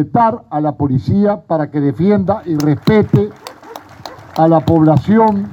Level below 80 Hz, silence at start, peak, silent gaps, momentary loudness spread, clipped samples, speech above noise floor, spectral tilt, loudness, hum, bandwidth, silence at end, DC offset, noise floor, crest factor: -44 dBFS; 0 s; 0 dBFS; none; 21 LU; under 0.1%; 22 dB; -8.5 dB/octave; -13 LUFS; none; 19 kHz; 0 s; under 0.1%; -34 dBFS; 14 dB